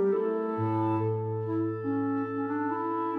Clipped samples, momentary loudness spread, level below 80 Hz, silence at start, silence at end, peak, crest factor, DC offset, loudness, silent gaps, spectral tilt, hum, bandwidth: under 0.1%; 3 LU; -80 dBFS; 0 s; 0 s; -18 dBFS; 10 dB; under 0.1%; -30 LUFS; none; -11 dB/octave; none; 4.2 kHz